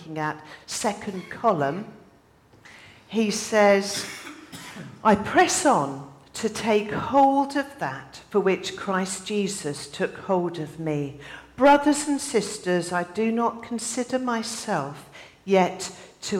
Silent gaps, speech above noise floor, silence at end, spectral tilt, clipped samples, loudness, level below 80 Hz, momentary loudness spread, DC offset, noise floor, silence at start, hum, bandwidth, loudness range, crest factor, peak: none; 32 dB; 0 s; -4 dB/octave; under 0.1%; -24 LUFS; -60 dBFS; 19 LU; under 0.1%; -56 dBFS; 0 s; none; 17 kHz; 5 LU; 18 dB; -8 dBFS